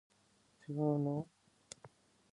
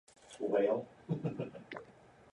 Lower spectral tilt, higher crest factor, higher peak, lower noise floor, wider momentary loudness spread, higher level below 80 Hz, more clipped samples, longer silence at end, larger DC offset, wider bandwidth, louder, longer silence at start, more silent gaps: about the same, -8 dB/octave vs -7.5 dB/octave; about the same, 20 dB vs 18 dB; about the same, -22 dBFS vs -20 dBFS; first, -72 dBFS vs -60 dBFS; first, 21 LU vs 17 LU; about the same, -80 dBFS vs -76 dBFS; neither; about the same, 0.45 s vs 0.4 s; neither; about the same, 11 kHz vs 11 kHz; about the same, -38 LUFS vs -37 LUFS; first, 0.7 s vs 0.25 s; neither